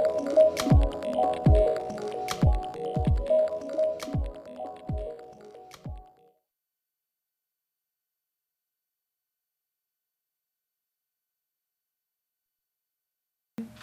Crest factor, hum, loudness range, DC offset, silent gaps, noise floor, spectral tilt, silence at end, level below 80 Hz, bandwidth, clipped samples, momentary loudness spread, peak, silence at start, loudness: 20 dB; none; 17 LU; under 0.1%; none; -87 dBFS; -7 dB/octave; 0 s; -36 dBFS; 14.5 kHz; under 0.1%; 21 LU; -10 dBFS; 0 s; -26 LUFS